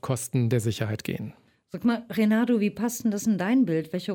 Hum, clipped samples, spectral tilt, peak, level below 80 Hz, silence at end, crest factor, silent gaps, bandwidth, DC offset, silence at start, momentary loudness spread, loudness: none; under 0.1%; -6 dB/octave; -10 dBFS; -64 dBFS; 0 s; 16 dB; none; 17.5 kHz; under 0.1%; 0.05 s; 10 LU; -26 LUFS